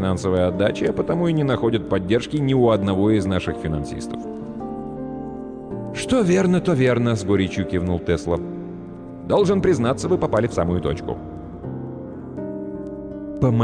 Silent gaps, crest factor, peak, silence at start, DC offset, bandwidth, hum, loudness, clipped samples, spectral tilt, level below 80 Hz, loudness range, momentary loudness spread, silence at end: none; 14 dB; -8 dBFS; 0 s; under 0.1%; 10 kHz; none; -22 LUFS; under 0.1%; -7 dB/octave; -42 dBFS; 5 LU; 14 LU; 0 s